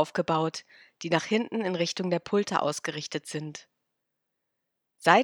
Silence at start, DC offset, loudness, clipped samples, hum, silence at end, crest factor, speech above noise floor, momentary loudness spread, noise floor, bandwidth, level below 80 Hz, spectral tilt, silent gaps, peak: 0 s; under 0.1%; -29 LUFS; under 0.1%; none; 0 s; 26 dB; 53 dB; 12 LU; -82 dBFS; 18 kHz; -74 dBFS; -4.5 dB/octave; none; -2 dBFS